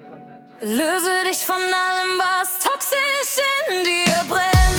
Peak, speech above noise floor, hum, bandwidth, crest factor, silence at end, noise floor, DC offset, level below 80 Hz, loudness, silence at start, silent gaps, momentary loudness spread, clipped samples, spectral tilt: -2 dBFS; 21 dB; none; 19 kHz; 16 dB; 0 s; -41 dBFS; under 0.1%; -30 dBFS; -19 LUFS; 0 s; none; 3 LU; under 0.1%; -3 dB/octave